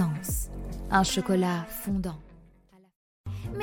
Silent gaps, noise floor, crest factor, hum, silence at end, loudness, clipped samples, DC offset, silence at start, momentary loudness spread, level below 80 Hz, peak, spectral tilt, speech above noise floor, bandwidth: 2.96-3.24 s; -59 dBFS; 20 dB; none; 0 s; -29 LUFS; under 0.1%; under 0.1%; 0 s; 15 LU; -42 dBFS; -10 dBFS; -5 dB/octave; 32 dB; 17.5 kHz